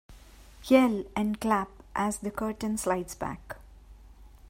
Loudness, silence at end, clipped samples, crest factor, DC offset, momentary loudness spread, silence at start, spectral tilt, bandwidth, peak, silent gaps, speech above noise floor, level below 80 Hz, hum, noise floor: -29 LUFS; 0.25 s; under 0.1%; 22 dB; under 0.1%; 19 LU; 0.1 s; -5 dB/octave; 16 kHz; -8 dBFS; none; 23 dB; -52 dBFS; none; -51 dBFS